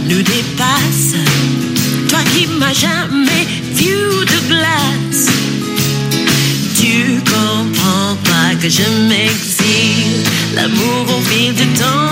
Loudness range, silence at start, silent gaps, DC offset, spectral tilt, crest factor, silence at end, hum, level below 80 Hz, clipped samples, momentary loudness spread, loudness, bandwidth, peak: 1 LU; 0 s; none; under 0.1%; -3.5 dB/octave; 12 dB; 0 s; none; -46 dBFS; under 0.1%; 3 LU; -12 LUFS; 16.5 kHz; 0 dBFS